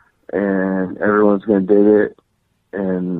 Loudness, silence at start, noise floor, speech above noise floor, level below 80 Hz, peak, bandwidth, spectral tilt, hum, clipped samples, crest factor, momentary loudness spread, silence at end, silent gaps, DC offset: -16 LUFS; 0.35 s; -65 dBFS; 50 dB; -56 dBFS; -2 dBFS; 3.9 kHz; -11.5 dB/octave; none; under 0.1%; 14 dB; 12 LU; 0 s; none; under 0.1%